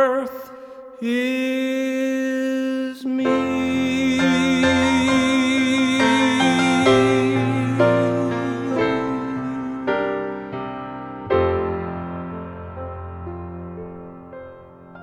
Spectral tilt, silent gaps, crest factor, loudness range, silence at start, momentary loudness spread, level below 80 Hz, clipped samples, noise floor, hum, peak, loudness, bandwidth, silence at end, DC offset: -5.5 dB/octave; none; 18 dB; 10 LU; 0 s; 17 LU; -48 dBFS; under 0.1%; -42 dBFS; none; -4 dBFS; -20 LUFS; 14 kHz; 0 s; under 0.1%